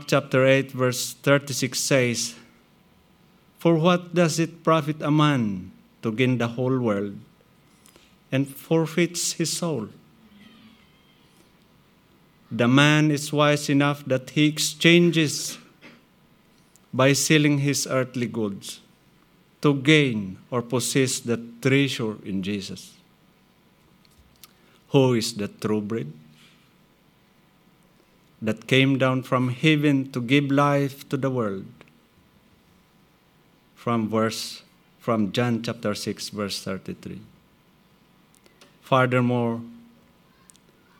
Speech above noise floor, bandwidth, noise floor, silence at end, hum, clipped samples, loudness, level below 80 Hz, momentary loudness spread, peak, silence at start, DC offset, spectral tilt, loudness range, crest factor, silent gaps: 37 dB; 19 kHz; -59 dBFS; 1.2 s; none; under 0.1%; -23 LUFS; -68 dBFS; 14 LU; -2 dBFS; 0 s; under 0.1%; -5 dB/octave; 9 LU; 24 dB; none